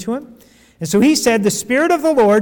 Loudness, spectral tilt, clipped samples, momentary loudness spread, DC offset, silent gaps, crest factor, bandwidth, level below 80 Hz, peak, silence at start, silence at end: -15 LUFS; -4.5 dB/octave; under 0.1%; 13 LU; under 0.1%; none; 10 dB; 19 kHz; -52 dBFS; -6 dBFS; 0 s; 0 s